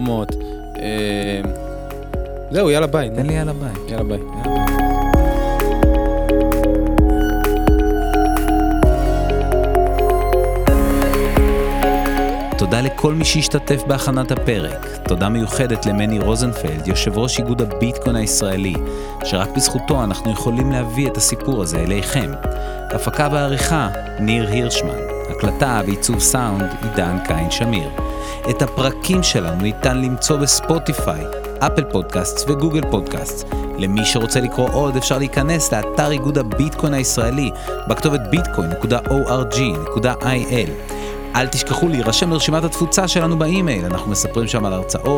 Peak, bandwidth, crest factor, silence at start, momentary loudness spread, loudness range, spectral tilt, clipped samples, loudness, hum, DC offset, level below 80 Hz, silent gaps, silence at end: 0 dBFS; 20 kHz; 16 dB; 0 s; 8 LU; 3 LU; -4.5 dB/octave; under 0.1%; -18 LUFS; none; under 0.1%; -24 dBFS; none; 0 s